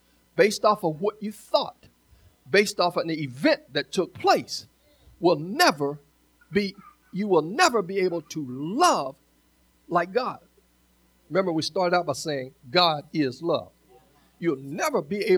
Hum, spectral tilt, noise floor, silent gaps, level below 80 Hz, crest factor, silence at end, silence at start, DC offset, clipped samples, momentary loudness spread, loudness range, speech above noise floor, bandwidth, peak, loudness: none; -4 dB/octave; -63 dBFS; none; -66 dBFS; 20 dB; 0 s; 0.35 s; under 0.1%; under 0.1%; 12 LU; 3 LU; 39 dB; over 20 kHz; -4 dBFS; -25 LUFS